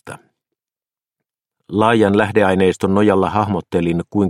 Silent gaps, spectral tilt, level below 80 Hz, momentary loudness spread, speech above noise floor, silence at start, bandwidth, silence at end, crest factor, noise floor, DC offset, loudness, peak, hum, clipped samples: none; -7 dB/octave; -50 dBFS; 5 LU; over 75 dB; 0.05 s; 12 kHz; 0 s; 18 dB; under -90 dBFS; under 0.1%; -16 LUFS; 0 dBFS; none; under 0.1%